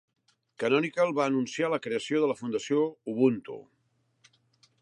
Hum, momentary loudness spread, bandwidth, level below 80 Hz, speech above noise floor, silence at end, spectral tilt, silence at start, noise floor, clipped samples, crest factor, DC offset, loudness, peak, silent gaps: none; 7 LU; 10.5 kHz; -78 dBFS; 43 dB; 1.2 s; -5.5 dB/octave; 0.6 s; -70 dBFS; under 0.1%; 18 dB; under 0.1%; -28 LUFS; -10 dBFS; none